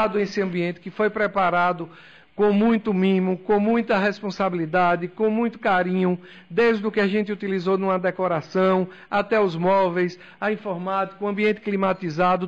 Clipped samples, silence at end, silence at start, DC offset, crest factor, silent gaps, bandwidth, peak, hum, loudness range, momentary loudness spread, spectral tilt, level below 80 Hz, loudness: under 0.1%; 0 s; 0 s; under 0.1%; 10 dB; none; 7.4 kHz; -12 dBFS; none; 1 LU; 6 LU; -7.5 dB/octave; -58 dBFS; -22 LUFS